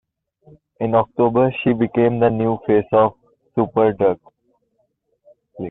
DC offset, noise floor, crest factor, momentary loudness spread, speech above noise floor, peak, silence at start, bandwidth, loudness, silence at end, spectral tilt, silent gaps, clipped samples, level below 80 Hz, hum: under 0.1%; -68 dBFS; 16 dB; 8 LU; 51 dB; -4 dBFS; 0.8 s; 4 kHz; -18 LUFS; 0 s; -11 dB/octave; none; under 0.1%; -52 dBFS; none